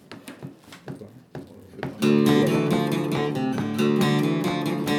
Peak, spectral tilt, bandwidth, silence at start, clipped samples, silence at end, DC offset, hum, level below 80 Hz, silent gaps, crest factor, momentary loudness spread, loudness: -6 dBFS; -6.5 dB/octave; 18.5 kHz; 0.1 s; under 0.1%; 0 s; under 0.1%; none; -60 dBFS; none; 18 dB; 22 LU; -22 LUFS